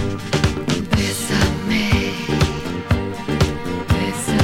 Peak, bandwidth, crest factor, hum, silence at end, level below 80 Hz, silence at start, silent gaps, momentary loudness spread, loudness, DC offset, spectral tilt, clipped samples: -2 dBFS; 17 kHz; 18 dB; none; 0 s; -30 dBFS; 0 s; none; 3 LU; -20 LUFS; under 0.1%; -5 dB/octave; under 0.1%